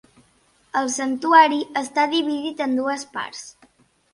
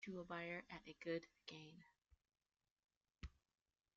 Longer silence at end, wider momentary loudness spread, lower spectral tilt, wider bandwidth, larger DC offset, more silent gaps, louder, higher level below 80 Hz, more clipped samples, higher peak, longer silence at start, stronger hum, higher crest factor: about the same, 0.65 s vs 0.65 s; first, 16 LU vs 13 LU; second, -1.5 dB/octave vs -4 dB/octave; first, 11.5 kHz vs 7.4 kHz; neither; second, none vs 2.71-2.76 s, 2.97-3.01 s; first, -20 LUFS vs -53 LUFS; about the same, -70 dBFS vs -70 dBFS; neither; first, -2 dBFS vs -34 dBFS; first, 0.75 s vs 0 s; neither; about the same, 22 dB vs 22 dB